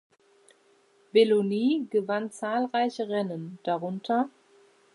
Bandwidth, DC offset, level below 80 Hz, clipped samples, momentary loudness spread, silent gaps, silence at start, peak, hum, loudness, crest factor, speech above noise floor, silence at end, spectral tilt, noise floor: 11.5 kHz; under 0.1%; -84 dBFS; under 0.1%; 9 LU; none; 1.15 s; -10 dBFS; none; -27 LUFS; 20 dB; 37 dB; 0.65 s; -6 dB/octave; -63 dBFS